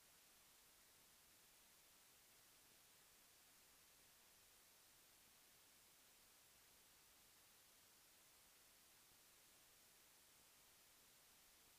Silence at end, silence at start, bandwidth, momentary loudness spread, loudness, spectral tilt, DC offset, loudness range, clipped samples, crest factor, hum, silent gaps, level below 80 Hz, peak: 0 s; 0 s; 15.5 kHz; 0 LU; -69 LUFS; -0.5 dB/octave; under 0.1%; 0 LU; under 0.1%; 14 dB; none; none; under -90 dBFS; -58 dBFS